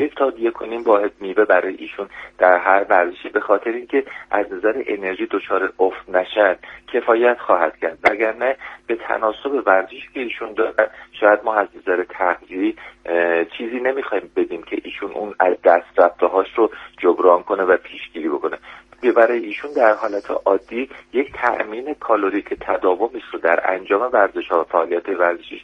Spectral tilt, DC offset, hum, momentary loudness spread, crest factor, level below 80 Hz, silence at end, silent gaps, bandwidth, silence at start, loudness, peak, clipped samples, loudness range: -6 dB/octave; under 0.1%; none; 11 LU; 18 dB; -58 dBFS; 0 s; none; 6.6 kHz; 0 s; -19 LUFS; 0 dBFS; under 0.1%; 3 LU